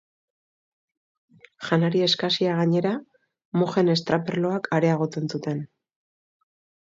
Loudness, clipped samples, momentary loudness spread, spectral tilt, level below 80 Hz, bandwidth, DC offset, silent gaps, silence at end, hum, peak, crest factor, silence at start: -24 LUFS; under 0.1%; 10 LU; -6.5 dB/octave; -68 dBFS; 7.8 kHz; under 0.1%; 3.45-3.52 s; 1.15 s; none; -6 dBFS; 20 dB; 1.6 s